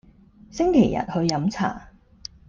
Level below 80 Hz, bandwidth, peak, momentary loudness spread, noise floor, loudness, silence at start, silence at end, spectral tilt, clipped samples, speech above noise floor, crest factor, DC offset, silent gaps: -48 dBFS; 7.4 kHz; -4 dBFS; 22 LU; -51 dBFS; -22 LUFS; 0.5 s; 0.65 s; -6 dB/octave; under 0.1%; 29 dB; 20 dB; under 0.1%; none